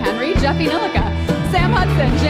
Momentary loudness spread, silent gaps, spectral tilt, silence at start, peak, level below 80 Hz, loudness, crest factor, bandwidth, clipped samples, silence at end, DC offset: 4 LU; none; -6.5 dB/octave; 0 s; -4 dBFS; -24 dBFS; -17 LUFS; 12 dB; 14.5 kHz; under 0.1%; 0 s; under 0.1%